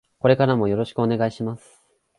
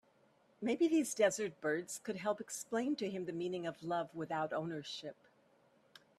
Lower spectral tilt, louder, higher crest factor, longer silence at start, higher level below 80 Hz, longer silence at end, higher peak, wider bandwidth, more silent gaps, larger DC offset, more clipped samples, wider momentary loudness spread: first, -8 dB/octave vs -4 dB/octave; first, -21 LUFS vs -38 LUFS; about the same, 20 dB vs 20 dB; second, 0.25 s vs 0.6 s; first, -56 dBFS vs -82 dBFS; second, 0.6 s vs 1.05 s; first, -2 dBFS vs -18 dBFS; second, 11 kHz vs 14 kHz; neither; neither; neither; about the same, 12 LU vs 10 LU